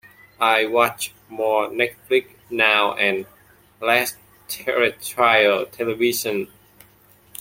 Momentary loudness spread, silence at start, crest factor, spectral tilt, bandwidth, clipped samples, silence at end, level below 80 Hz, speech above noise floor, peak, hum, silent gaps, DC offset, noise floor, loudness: 13 LU; 0.4 s; 20 dB; -2.5 dB/octave; 16.5 kHz; under 0.1%; 0.95 s; -64 dBFS; 33 dB; -2 dBFS; none; none; under 0.1%; -54 dBFS; -20 LUFS